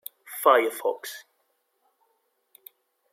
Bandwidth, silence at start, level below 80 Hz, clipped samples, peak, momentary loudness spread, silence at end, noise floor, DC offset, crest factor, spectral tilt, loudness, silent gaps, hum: 16.5 kHz; 0.3 s; under -90 dBFS; under 0.1%; -4 dBFS; 19 LU; 1.95 s; -73 dBFS; under 0.1%; 24 dB; -0.5 dB/octave; -23 LUFS; none; none